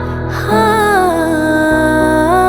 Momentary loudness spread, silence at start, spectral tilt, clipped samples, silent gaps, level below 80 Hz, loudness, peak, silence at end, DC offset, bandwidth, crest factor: 4 LU; 0 s; -5.5 dB/octave; under 0.1%; none; -30 dBFS; -12 LUFS; 0 dBFS; 0 s; under 0.1%; over 20 kHz; 12 dB